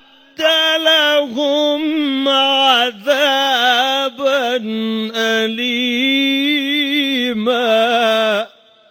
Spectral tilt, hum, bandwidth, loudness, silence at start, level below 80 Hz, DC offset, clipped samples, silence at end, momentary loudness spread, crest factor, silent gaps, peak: -2.5 dB/octave; none; 17 kHz; -14 LUFS; 0.4 s; -68 dBFS; under 0.1%; under 0.1%; 0.45 s; 7 LU; 14 dB; none; 0 dBFS